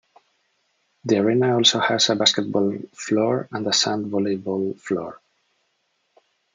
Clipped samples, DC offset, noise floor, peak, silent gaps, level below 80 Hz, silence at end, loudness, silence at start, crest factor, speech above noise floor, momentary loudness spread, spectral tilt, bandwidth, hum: under 0.1%; under 0.1%; -71 dBFS; -2 dBFS; none; -72 dBFS; 1.4 s; -21 LUFS; 1.05 s; 22 dB; 50 dB; 11 LU; -3.5 dB/octave; 9.6 kHz; none